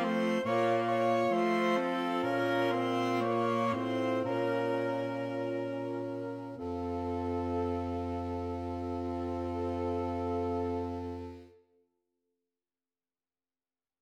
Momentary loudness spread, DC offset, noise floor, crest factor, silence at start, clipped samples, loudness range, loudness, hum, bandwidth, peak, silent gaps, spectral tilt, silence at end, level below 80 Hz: 9 LU; under 0.1%; under -90 dBFS; 16 dB; 0 s; under 0.1%; 8 LU; -33 LUFS; none; 15.5 kHz; -16 dBFS; none; -7 dB/octave; 2.55 s; -56 dBFS